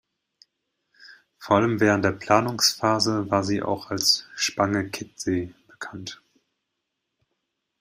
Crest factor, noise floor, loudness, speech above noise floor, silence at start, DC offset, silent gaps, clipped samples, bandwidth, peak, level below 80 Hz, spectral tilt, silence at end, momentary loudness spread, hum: 24 dB; -80 dBFS; -23 LUFS; 57 dB; 1.05 s; under 0.1%; none; under 0.1%; 16 kHz; -2 dBFS; -62 dBFS; -3.5 dB/octave; 1.65 s; 17 LU; none